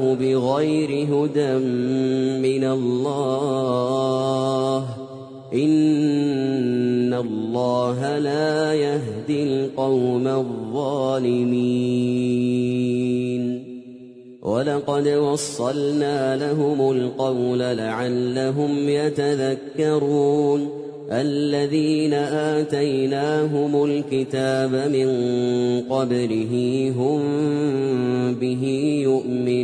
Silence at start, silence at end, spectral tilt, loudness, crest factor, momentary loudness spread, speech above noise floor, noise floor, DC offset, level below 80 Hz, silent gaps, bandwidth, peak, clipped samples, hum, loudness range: 0 s; 0 s; -6.5 dB/octave; -21 LUFS; 14 dB; 4 LU; 21 dB; -41 dBFS; under 0.1%; -62 dBFS; none; 10.5 kHz; -6 dBFS; under 0.1%; none; 1 LU